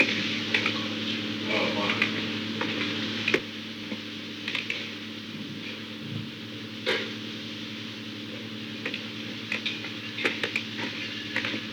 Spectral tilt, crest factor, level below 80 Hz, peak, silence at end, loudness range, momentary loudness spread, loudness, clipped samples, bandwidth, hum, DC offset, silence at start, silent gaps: -4 dB/octave; 24 dB; -70 dBFS; -8 dBFS; 0 s; 7 LU; 11 LU; -30 LUFS; under 0.1%; over 20 kHz; none; under 0.1%; 0 s; none